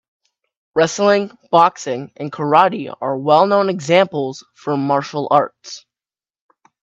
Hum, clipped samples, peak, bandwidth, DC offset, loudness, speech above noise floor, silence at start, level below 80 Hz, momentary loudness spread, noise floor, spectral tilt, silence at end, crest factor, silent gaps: none; under 0.1%; 0 dBFS; 8 kHz; under 0.1%; -17 LUFS; over 74 dB; 0.75 s; -66 dBFS; 13 LU; under -90 dBFS; -5 dB/octave; 1.05 s; 18 dB; none